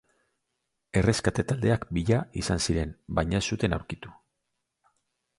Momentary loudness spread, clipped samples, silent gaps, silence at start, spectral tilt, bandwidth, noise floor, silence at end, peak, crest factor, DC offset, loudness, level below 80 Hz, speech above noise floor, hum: 7 LU; under 0.1%; none; 0.95 s; -5.5 dB/octave; 11.5 kHz; -81 dBFS; 1.25 s; -8 dBFS; 20 dB; under 0.1%; -27 LUFS; -42 dBFS; 54 dB; none